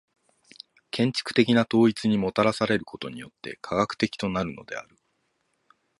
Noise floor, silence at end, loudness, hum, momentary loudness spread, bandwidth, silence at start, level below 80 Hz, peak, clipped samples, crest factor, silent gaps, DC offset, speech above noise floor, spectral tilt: -73 dBFS; 1.15 s; -24 LUFS; none; 17 LU; 11.5 kHz; 0.95 s; -58 dBFS; -6 dBFS; under 0.1%; 22 dB; none; under 0.1%; 48 dB; -6 dB/octave